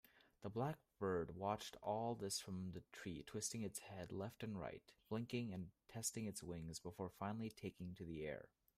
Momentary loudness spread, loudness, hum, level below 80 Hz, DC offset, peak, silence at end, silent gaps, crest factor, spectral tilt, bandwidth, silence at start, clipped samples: 8 LU; -48 LUFS; none; -74 dBFS; under 0.1%; -28 dBFS; 0.3 s; none; 20 dB; -4.5 dB/octave; 15.5 kHz; 0.15 s; under 0.1%